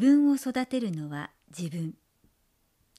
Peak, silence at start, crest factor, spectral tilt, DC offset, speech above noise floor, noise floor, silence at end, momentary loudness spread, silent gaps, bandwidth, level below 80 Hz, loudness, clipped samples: -12 dBFS; 0 s; 16 dB; -6.5 dB/octave; under 0.1%; 44 dB; -71 dBFS; 1.05 s; 16 LU; none; 13.5 kHz; -72 dBFS; -29 LUFS; under 0.1%